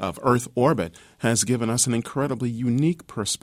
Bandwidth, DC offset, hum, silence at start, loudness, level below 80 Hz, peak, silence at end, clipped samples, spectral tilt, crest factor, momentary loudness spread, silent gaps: 16 kHz; under 0.1%; none; 0 s; -23 LUFS; -56 dBFS; -6 dBFS; 0.05 s; under 0.1%; -4.5 dB/octave; 18 dB; 6 LU; none